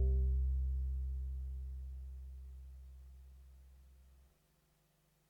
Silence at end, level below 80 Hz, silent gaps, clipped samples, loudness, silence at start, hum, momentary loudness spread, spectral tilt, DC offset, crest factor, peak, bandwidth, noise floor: 1.3 s; -40 dBFS; none; under 0.1%; -41 LUFS; 0 s; 50 Hz at -80 dBFS; 24 LU; -9.5 dB/octave; under 0.1%; 14 dB; -26 dBFS; 0.8 kHz; -75 dBFS